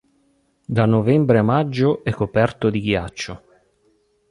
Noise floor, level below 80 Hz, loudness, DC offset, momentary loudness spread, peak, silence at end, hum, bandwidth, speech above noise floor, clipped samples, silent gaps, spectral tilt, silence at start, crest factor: -63 dBFS; -46 dBFS; -19 LUFS; under 0.1%; 14 LU; -2 dBFS; 0.95 s; none; 11 kHz; 44 dB; under 0.1%; none; -7.5 dB/octave; 0.7 s; 18 dB